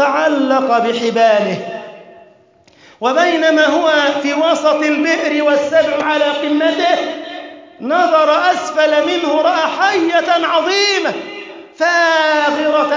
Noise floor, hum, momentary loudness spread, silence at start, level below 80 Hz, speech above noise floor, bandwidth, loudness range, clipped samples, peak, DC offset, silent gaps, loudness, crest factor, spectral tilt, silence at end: -49 dBFS; none; 13 LU; 0 s; -66 dBFS; 35 dB; 7.6 kHz; 2 LU; under 0.1%; -2 dBFS; under 0.1%; none; -13 LUFS; 12 dB; -3 dB/octave; 0 s